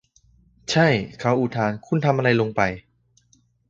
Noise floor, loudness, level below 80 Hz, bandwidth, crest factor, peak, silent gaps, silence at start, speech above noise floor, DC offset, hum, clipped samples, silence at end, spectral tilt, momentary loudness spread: -62 dBFS; -21 LUFS; -54 dBFS; 8 kHz; 20 dB; -4 dBFS; none; 0.7 s; 41 dB; under 0.1%; 60 Hz at -45 dBFS; under 0.1%; 0.9 s; -6 dB/octave; 7 LU